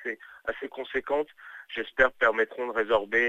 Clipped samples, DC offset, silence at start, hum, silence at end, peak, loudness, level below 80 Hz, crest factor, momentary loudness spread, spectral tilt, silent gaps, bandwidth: under 0.1%; under 0.1%; 0 s; none; 0 s; -6 dBFS; -28 LUFS; -56 dBFS; 22 dB; 13 LU; -4.5 dB/octave; none; 8 kHz